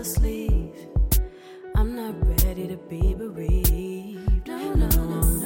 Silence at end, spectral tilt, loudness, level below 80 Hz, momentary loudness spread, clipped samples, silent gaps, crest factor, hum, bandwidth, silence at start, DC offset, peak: 0 s; -5.5 dB/octave; -25 LUFS; -24 dBFS; 8 LU; under 0.1%; none; 16 dB; none; 17 kHz; 0 s; under 0.1%; -6 dBFS